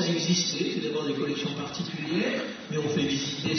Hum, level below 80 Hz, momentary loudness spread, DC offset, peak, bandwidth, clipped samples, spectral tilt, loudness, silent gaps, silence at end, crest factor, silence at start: none; -64 dBFS; 8 LU; under 0.1%; -14 dBFS; 6.6 kHz; under 0.1%; -4 dB/octave; -28 LUFS; none; 0 s; 14 dB; 0 s